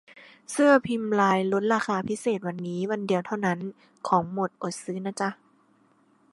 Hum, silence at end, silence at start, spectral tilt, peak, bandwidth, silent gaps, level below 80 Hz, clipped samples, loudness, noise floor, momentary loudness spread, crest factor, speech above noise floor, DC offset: none; 1 s; 0.15 s; -5.5 dB/octave; -6 dBFS; 11.5 kHz; none; -70 dBFS; under 0.1%; -26 LUFS; -63 dBFS; 12 LU; 20 dB; 37 dB; under 0.1%